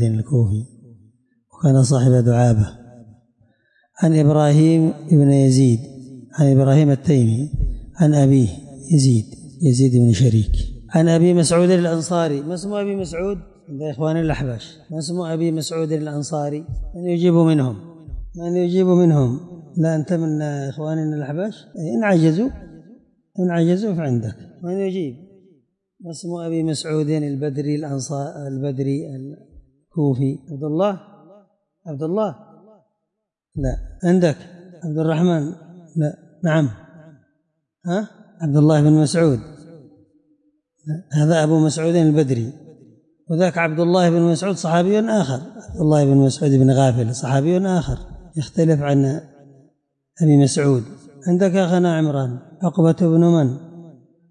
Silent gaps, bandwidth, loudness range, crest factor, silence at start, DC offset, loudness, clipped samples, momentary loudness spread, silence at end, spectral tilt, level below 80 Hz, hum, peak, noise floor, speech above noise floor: none; 11 kHz; 8 LU; 14 dB; 0 s; under 0.1%; -18 LUFS; under 0.1%; 16 LU; 0.4 s; -7 dB/octave; -38 dBFS; none; -4 dBFS; -79 dBFS; 62 dB